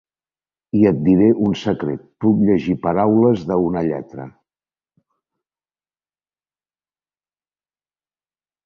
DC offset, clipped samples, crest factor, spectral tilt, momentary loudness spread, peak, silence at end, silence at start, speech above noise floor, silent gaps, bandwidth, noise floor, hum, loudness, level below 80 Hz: under 0.1%; under 0.1%; 18 dB; -9 dB/octave; 12 LU; -2 dBFS; 4.35 s; 0.75 s; over 73 dB; none; 7 kHz; under -90 dBFS; 50 Hz at -55 dBFS; -17 LUFS; -50 dBFS